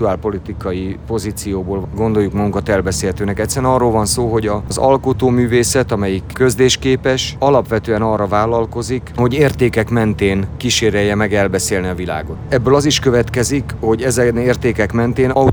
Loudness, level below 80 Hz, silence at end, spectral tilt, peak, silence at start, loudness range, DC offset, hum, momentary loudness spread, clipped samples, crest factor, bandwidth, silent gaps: -15 LUFS; -34 dBFS; 0 s; -5 dB/octave; 0 dBFS; 0 s; 2 LU; under 0.1%; none; 8 LU; under 0.1%; 14 dB; over 20 kHz; none